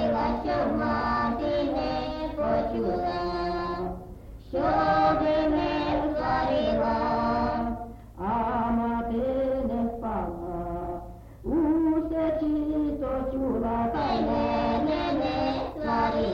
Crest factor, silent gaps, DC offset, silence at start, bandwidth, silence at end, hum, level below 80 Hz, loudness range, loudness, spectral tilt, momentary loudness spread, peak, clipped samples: 14 dB; none; under 0.1%; 0 s; 7.2 kHz; 0 s; none; -42 dBFS; 4 LU; -27 LUFS; -8 dB/octave; 9 LU; -14 dBFS; under 0.1%